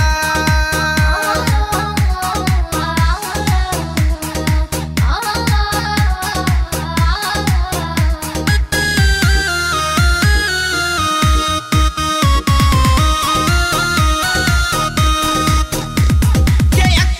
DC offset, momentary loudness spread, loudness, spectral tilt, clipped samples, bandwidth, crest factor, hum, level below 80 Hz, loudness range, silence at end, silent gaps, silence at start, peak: under 0.1%; 5 LU; -15 LUFS; -4 dB/octave; under 0.1%; 16.5 kHz; 14 dB; none; -18 dBFS; 3 LU; 0 s; none; 0 s; 0 dBFS